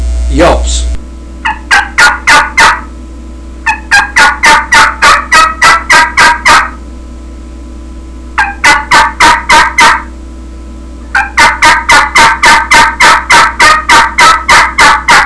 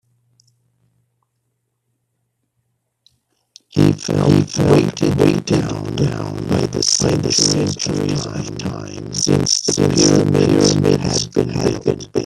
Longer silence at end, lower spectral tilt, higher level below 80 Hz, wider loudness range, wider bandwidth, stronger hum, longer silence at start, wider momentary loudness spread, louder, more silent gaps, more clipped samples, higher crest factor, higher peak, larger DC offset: about the same, 0 s vs 0 s; second, -1.5 dB/octave vs -4.5 dB/octave; first, -20 dBFS vs -44 dBFS; about the same, 5 LU vs 5 LU; second, 11 kHz vs 13 kHz; neither; second, 0 s vs 3.75 s; about the same, 10 LU vs 10 LU; first, -4 LUFS vs -16 LUFS; neither; first, 8% vs under 0.1%; second, 6 dB vs 18 dB; about the same, 0 dBFS vs 0 dBFS; first, 2% vs under 0.1%